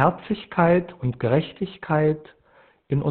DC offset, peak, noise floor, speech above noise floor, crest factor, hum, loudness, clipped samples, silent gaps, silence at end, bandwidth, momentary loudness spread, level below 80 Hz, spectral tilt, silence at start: under 0.1%; -4 dBFS; -57 dBFS; 35 dB; 20 dB; none; -23 LUFS; under 0.1%; none; 0 s; 4.4 kHz; 12 LU; -52 dBFS; -6.5 dB/octave; 0 s